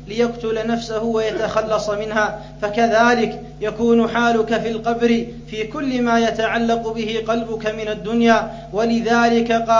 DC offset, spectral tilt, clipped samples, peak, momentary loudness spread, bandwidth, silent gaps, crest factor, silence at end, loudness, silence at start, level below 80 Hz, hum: 0.1%; -5 dB/octave; under 0.1%; 0 dBFS; 9 LU; 7.6 kHz; none; 18 dB; 0 s; -19 LUFS; 0 s; -42 dBFS; none